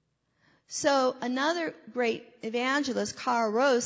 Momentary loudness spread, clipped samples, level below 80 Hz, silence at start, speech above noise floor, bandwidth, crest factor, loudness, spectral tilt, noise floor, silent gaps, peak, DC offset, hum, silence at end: 9 LU; under 0.1%; -72 dBFS; 0.7 s; 42 dB; 8 kHz; 16 dB; -29 LUFS; -3 dB/octave; -70 dBFS; none; -14 dBFS; under 0.1%; none; 0 s